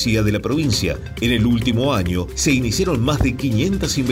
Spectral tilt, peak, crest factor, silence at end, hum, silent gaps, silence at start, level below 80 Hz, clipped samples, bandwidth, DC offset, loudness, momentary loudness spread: -5 dB/octave; -4 dBFS; 14 dB; 0 s; none; none; 0 s; -32 dBFS; under 0.1%; 16 kHz; under 0.1%; -19 LUFS; 3 LU